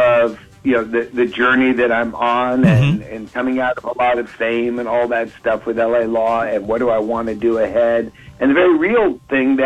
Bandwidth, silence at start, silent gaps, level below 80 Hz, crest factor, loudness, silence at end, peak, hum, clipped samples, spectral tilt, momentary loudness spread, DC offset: 9 kHz; 0 s; none; -46 dBFS; 14 dB; -17 LUFS; 0 s; -2 dBFS; none; under 0.1%; -8 dB/octave; 7 LU; under 0.1%